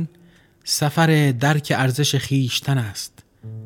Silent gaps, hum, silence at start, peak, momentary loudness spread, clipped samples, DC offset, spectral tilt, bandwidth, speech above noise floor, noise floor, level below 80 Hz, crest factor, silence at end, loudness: none; none; 0 s; -4 dBFS; 16 LU; under 0.1%; under 0.1%; -4.5 dB/octave; 17.5 kHz; 33 dB; -52 dBFS; -58 dBFS; 16 dB; 0 s; -19 LUFS